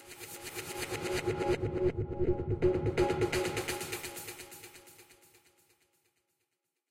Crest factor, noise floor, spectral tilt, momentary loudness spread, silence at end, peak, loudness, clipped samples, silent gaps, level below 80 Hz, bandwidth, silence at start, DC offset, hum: 20 dB; -84 dBFS; -5 dB/octave; 16 LU; 1.55 s; -16 dBFS; -34 LUFS; under 0.1%; none; -50 dBFS; 16 kHz; 0 s; under 0.1%; none